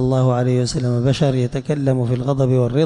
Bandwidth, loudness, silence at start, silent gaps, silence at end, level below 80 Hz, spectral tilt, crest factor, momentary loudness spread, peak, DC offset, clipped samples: 10 kHz; -18 LUFS; 0 s; none; 0 s; -42 dBFS; -7.5 dB/octave; 12 dB; 4 LU; -6 dBFS; under 0.1%; under 0.1%